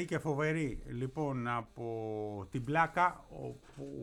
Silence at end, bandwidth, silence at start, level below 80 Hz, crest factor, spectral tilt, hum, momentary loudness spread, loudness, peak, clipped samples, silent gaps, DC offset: 0 s; 13 kHz; 0 s; -56 dBFS; 20 dB; -7 dB/octave; none; 15 LU; -35 LUFS; -16 dBFS; under 0.1%; none; under 0.1%